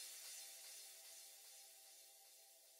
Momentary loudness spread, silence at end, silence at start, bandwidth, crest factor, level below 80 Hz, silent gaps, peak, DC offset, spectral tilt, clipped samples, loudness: 10 LU; 0 s; 0 s; 16 kHz; 16 dB; under -90 dBFS; none; -44 dBFS; under 0.1%; 5 dB/octave; under 0.1%; -57 LUFS